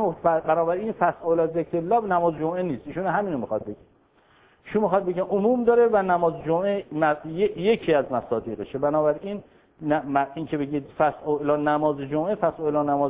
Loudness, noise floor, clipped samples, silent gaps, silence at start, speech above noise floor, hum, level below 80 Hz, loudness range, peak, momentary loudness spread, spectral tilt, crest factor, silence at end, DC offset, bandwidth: -24 LUFS; -59 dBFS; under 0.1%; none; 0 s; 36 dB; none; -58 dBFS; 4 LU; -6 dBFS; 8 LU; -10.5 dB/octave; 18 dB; 0 s; under 0.1%; 4 kHz